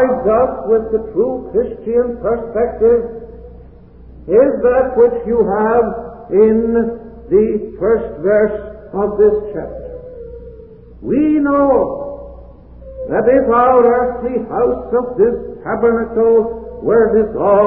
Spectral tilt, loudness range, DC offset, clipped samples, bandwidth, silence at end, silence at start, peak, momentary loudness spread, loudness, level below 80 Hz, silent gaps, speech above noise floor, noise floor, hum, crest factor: -13.5 dB/octave; 4 LU; 0.3%; under 0.1%; 3.2 kHz; 0 s; 0 s; 0 dBFS; 16 LU; -14 LUFS; -38 dBFS; none; 25 dB; -39 dBFS; none; 14 dB